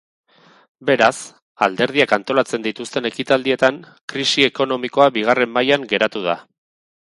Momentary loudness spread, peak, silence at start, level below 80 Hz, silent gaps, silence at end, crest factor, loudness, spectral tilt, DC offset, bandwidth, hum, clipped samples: 9 LU; 0 dBFS; 0.8 s; -62 dBFS; 1.42-1.55 s, 4.03-4.08 s; 0.7 s; 20 dB; -18 LUFS; -3.5 dB/octave; under 0.1%; 11.5 kHz; none; under 0.1%